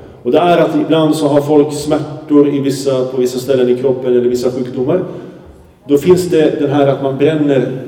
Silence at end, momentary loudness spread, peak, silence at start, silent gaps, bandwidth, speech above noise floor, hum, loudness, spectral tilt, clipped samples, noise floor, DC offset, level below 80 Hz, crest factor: 0 s; 6 LU; 0 dBFS; 0 s; none; 16.5 kHz; 26 dB; none; -13 LUFS; -6.5 dB/octave; under 0.1%; -38 dBFS; under 0.1%; -50 dBFS; 12 dB